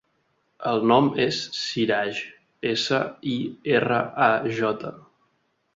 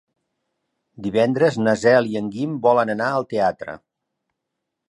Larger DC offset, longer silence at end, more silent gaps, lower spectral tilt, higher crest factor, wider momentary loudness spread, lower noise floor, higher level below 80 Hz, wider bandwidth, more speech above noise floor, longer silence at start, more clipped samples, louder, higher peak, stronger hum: neither; second, 0.75 s vs 1.1 s; neither; second, -5 dB/octave vs -6.5 dB/octave; about the same, 20 dB vs 18 dB; second, 12 LU vs 15 LU; second, -70 dBFS vs -80 dBFS; about the same, -64 dBFS vs -62 dBFS; second, 7.8 kHz vs 11 kHz; second, 47 dB vs 61 dB; second, 0.6 s vs 1 s; neither; second, -24 LUFS vs -19 LUFS; about the same, -4 dBFS vs -2 dBFS; neither